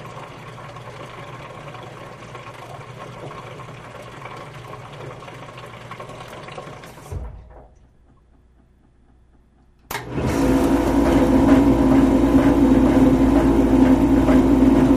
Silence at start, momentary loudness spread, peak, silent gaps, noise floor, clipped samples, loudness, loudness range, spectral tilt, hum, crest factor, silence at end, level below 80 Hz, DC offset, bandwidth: 0 s; 22 LU; -2 dBFS; none; -54 dBFS; under 0.1%; -16 LUFS; 23 LU; -7.5 dB/octave; none; 18 dB; 0 s; -32 dBFS; under 0.1%; 15 kHz